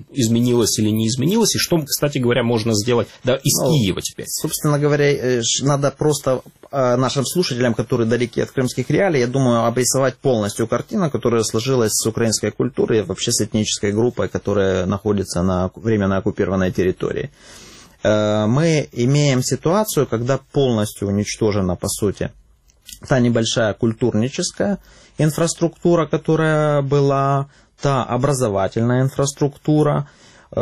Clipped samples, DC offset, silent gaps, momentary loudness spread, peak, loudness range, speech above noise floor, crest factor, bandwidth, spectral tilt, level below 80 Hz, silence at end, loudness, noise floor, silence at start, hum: under 0.1%; 0.2%; none; 5 LU; -2 dBFS; 2 LU; 29 dB; 16 dB; 15 kHz; -5 dB/octave; -48 dBFS; 0 s; -18 LUFS; -47 dBFS; 0 s; none